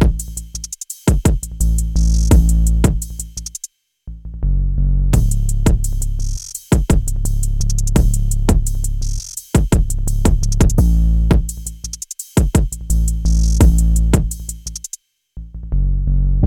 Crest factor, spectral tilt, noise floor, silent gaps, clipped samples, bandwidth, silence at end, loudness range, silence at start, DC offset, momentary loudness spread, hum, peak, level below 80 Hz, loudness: 14 dB; -6 dB/octave; -37 dBFS; none; under 0.1%; 16.5 kHz; 0 s; 3 LU; 0 s; under 0.1%; 14 LU; none; 0 dBFS; -16 dBFS; -18 LUFS